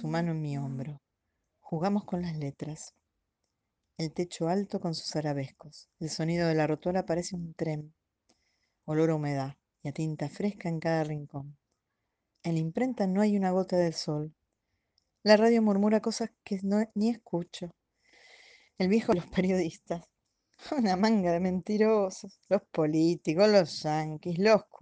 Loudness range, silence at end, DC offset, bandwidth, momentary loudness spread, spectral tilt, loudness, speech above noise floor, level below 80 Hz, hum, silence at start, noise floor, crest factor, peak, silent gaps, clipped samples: 8 LU; 0.05 s; under 0.1%; 9.4 kHz; 15 LU; -6.5 dB/octave; -29 LUFS; 54 dB; -66 dBFS; none; 0 s; -83 dBFS; 20 dB; -10 dBFS; none; under 0.1%